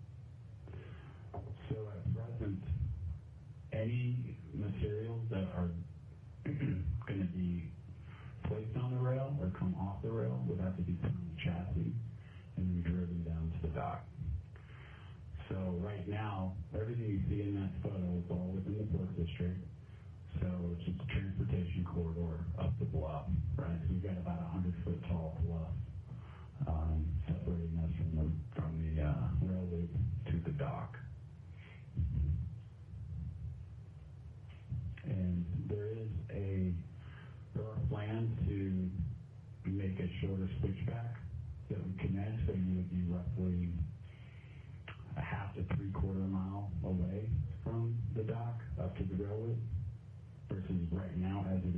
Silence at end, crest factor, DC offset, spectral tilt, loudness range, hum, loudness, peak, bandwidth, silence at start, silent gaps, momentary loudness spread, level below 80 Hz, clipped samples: 0 s; 14 dB; under 0.1%; -10.5 dB/octave; 4 LU; none; -39 LUFS; -24 dBFS; 3.6 kHz; 0 s; none; 14 LU; -50 dBFS; under 0.1%